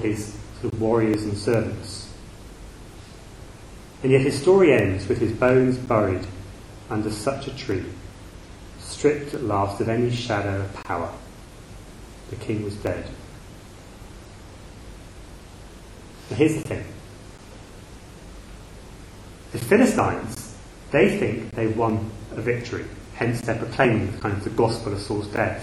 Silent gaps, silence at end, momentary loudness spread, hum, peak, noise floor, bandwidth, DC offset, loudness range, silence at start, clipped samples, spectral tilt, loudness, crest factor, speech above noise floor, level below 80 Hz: none; 0 s; 24 LU; none; -2 dBFS; -43 dBFS; 14 kHz; under 0.1%; 13 LU; 0 s; under 0.1%; -6.5 dB/octave; -23 LUFS; 22 dB; 20 dB; -46 dBFS